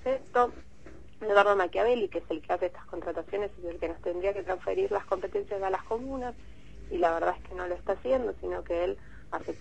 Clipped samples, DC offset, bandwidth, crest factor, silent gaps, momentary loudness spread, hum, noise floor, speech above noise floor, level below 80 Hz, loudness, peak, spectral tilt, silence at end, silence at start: under 0.1%; 0.5%; 8.6 kHz; 22 dB; none; 12 LU; none; -51 dBFS; 21 dB; -52 dBFS; -30 LUFS; -8 dBFS; -6 dB/octave; 0.05 s; 0 s